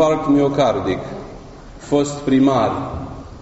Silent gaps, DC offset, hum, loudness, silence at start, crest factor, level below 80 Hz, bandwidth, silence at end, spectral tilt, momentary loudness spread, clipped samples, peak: none; under 0.1%; none; -18 LUFS; 0 s; 14 dB; -40 dBFS; 8 kHz; 0 s; -6 dB/octave; 18 LU; under 0.1%; -4 dBFS